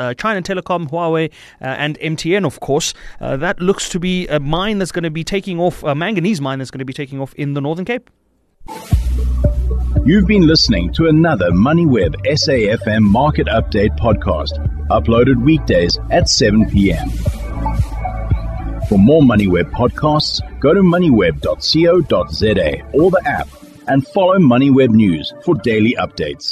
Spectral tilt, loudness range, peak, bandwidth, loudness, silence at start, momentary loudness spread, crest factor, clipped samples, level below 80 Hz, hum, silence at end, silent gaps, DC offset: -6 dB/octave; 7 LU; -2 dBFS; 13 kHz; -15 LUFS; 0 s; 11 LU; 12 dB; under 0.1%; -26 dBFS; none; 0 s; none; under 0.1%